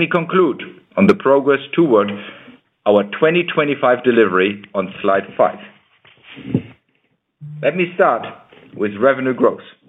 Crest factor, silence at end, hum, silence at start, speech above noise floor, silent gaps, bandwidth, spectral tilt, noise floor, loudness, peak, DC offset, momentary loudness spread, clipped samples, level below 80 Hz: 16 dB; 0.25 s; none; 0 s; 49 dB; none; 7.8 kHz; -8 dB/octave; -65 dBFS; -16 LUFS; 0 dBFS; under 0.1%; 10 LU; under 0.1%; -62 dBFS